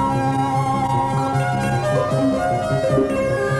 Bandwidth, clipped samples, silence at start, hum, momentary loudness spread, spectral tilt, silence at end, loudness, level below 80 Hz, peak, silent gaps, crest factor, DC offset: 12.5 kHz; under 0.1%; 0 s; none; 2 LU; -7 dB/octave; 0 s; -19 LUFS; -42 dBFS; -8 dBFS; none; 12 dB; under 0.1%